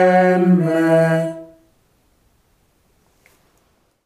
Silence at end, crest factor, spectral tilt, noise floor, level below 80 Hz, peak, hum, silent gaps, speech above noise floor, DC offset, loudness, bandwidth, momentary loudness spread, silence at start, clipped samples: 2.6 s; 16 dB; -8 dB/octave; -61 dBFS; -64 dBFS; -2 dBFS; none; none; 47 dB; under 0.1%; -15 LUFS; 13 kHz; 12 LU; 0 s; under 0.1%